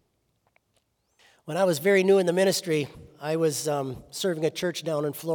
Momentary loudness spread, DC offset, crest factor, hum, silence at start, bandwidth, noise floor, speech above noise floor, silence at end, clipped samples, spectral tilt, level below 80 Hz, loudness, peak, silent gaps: 11 LU; under 0.1%; 18 dB; none; 1.45 s; over 20 kHz; -72 dBFS; 47 dB; 0 s; under 0.1%; -4.5 dB/octave; -66 dBFS; -25 LUFS; -10 dBFS; none